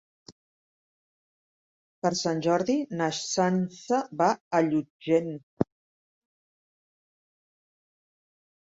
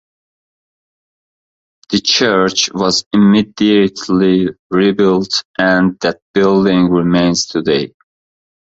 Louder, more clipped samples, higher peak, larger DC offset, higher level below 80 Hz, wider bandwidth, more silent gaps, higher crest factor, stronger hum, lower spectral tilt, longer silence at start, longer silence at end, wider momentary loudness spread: second, -27 LUFS vs -13 LUFS; neither; second, -6 dBFS vs 0 dBFS; neither; second, -68 dBFS vs -48 dBFS; about the same, 8 kHz vs 8 kHz; first, 0.32-2.02 s, 4.40-4.51 s, 4.90-5.00 s, 5.43-5.57 s vs 3.06-3.11 s, 4.59-4.70 s, 5.45-5.54 s, 6.22-6.34 s; first, 24 dB vs 14 dB; neither; about the same, -5 dB/octave vs -4.5 dB/octave; second, 0.3 s vs 1.9 s; first, 3 s vs 0.8 s; about the same, 7 LU vs 6 LU